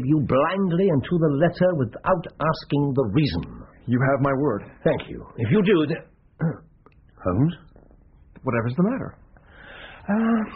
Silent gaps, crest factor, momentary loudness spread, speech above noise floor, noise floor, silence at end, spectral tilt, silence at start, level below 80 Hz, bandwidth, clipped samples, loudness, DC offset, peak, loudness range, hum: none; 14 dB; 13 LU; 32 dB; -53 dBFS; 0 s; -7 dB/octave; 0 s; -48 dBFS; 5.4 kHz; under 0.1%; -23 LUFS; under 0.1%; -8 dBFS; 6 LU; none